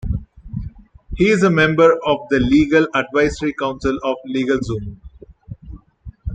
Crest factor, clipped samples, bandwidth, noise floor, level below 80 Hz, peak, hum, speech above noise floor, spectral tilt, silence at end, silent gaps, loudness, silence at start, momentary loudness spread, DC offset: 16 dB; under 0.1%; 9.2 kHz; -40 dBFS; -36 dBFS; -2 dBFS; none; 23 dB; -6.5 dB/octave; 0 s; none; -17 LUFS; 0.05 s; 22 LU; under 0.1%